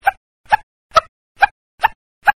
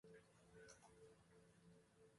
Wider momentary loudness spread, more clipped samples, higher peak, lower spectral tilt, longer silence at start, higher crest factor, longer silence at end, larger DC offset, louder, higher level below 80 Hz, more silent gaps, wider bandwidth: about the same, 3 LU vs 4 LU; neither; first, 0 dBFS vs -50 dBFS; second, -1.5 dB/octave vs -4 dB/octave; about the same, 0.05 s vs 0.05 s; about the same, 18 dB vs 20 dB; about the same, 0.05 s vs 0 s; neither; first, -18 LUFS vs -67 LUFS; first, -46 dBFS vs -86 dBFS; first, 0.17-0.44 s, 0.63-0.90 s, 1.09-1.35 s, 1.51-1.78 s, 1.95-2.21 s vs none; first, 15 kHz vs 11.5 kHz